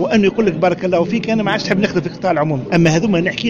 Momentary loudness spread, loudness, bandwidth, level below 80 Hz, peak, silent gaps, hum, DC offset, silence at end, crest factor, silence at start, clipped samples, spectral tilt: 4 LU; -16 LUFS; 7.6 kHz; -44 dBFS; -2 dBFS; none; none; under 0.1%; 0 s; 12 dB; 0 s; under 0.1%; -6 dB/octave